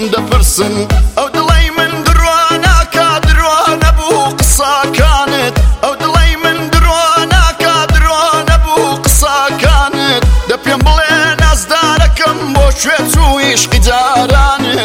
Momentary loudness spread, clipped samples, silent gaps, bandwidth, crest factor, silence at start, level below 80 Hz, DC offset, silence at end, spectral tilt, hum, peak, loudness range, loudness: 3 LU; under 0.1%; none; 16.5 kHz; 8 dB; 0 s; -12 dBFS; 0.2%; 0 s; -3.5 dB/octave; none; 0 dBFS; 1 LU; -9 LUFS